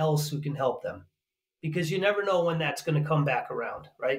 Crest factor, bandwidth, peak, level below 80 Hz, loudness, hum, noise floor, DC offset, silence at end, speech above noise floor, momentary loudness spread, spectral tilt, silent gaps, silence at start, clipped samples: 18 dB; 16 kHz; -12 dBFS; -68 dBFS; -28 LUFS; none; -87 dBFS; under 0.1%; 0 s; 59 dB; 11 LU; -6 dB/octave; none; 0 s; under 0.1%